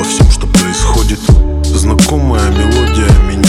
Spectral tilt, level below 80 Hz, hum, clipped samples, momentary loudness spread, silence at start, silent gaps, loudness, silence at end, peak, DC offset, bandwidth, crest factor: -5 dB/octave; -12 dBFS; none; under 0.1%; 3 LU; 0 s; none; -10 LUFS; 0 s; 0 dBFS; under 0.1%; 15.5 kHz; 8 dB